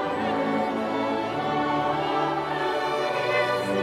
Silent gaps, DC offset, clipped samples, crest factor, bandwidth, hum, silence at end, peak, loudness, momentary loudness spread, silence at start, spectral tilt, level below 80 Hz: none; under 0.1%; under 0.1%; 14 dB; 15.5 kHz; none; 0 s; -12 dBFS; -25 LUFS; 3 LU; 0 s; -5.5 dB/octave; -58 dBFS